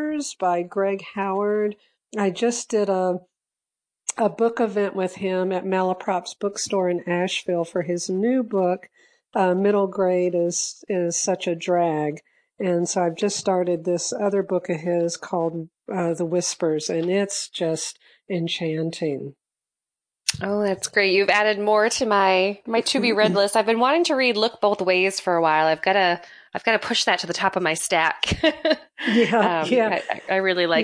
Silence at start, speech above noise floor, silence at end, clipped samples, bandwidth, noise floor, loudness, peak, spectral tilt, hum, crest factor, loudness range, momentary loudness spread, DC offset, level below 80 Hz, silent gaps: 0 s; 67 dB; 0 s; under 0.1%; 10.5 kHz; -89 dBFS; -22 LUFS; -4 dBFS; -3.5 dB/octave; none; 18 dB; 6 LU; 8 LU; under 0.1%; -56 dBFS; none